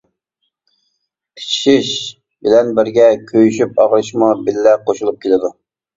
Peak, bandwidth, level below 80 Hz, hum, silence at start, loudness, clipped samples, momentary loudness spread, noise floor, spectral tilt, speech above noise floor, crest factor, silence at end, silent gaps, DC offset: 0 dBFS; 7.8 kHz; -56 dBFS; none; 1.35 s; -14 LUFS; under 0.1%; 10 LU; -71 dBFS; -4.5 dB/octave; 58 dB; 14 dB; 0.45 s; none; under 0.1%